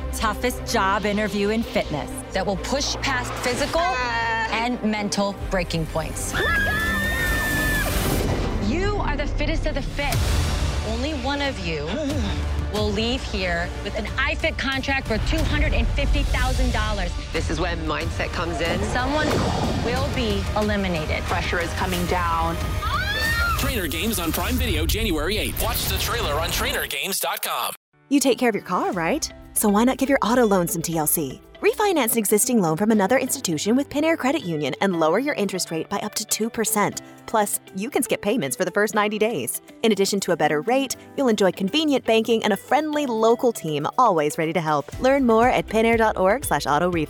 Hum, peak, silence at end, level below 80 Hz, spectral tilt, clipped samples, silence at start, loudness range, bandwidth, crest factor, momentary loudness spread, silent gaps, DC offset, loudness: none; -6 dBFS; 0 s; -32 dBFS; -4 dB/octave; under 0.1%; 0 s; 4 LU; over 20 kHz; 16 dB; 7 LU; 27.77-27.92 s; under 0.1%; -22 LUFS